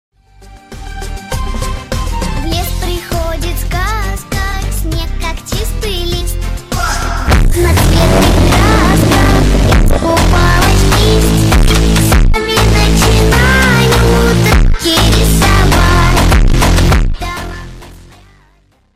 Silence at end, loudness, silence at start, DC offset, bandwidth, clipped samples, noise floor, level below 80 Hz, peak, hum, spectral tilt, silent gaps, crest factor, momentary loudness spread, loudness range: 0.8 s; -11 LUFS; 0.5 s; 0.8%; 16 kHz; under 0.1%; -50 dBFS; -14 dBFS; 0 dBFS; none; -5 dB/octave; none; 10 dB; 11 LU; 9 LU